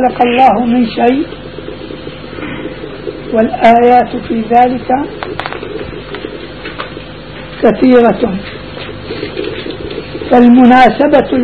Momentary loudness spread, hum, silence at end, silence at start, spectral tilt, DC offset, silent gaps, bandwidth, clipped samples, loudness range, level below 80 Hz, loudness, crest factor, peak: 19 LU; none; 0 s; 0 s; -7.5 dB/octave; 1%; none; 5.4 kHz; 0.7%; 6 LU; -36 dBFS; -10 LUFS; 12 dB; 0 dBFS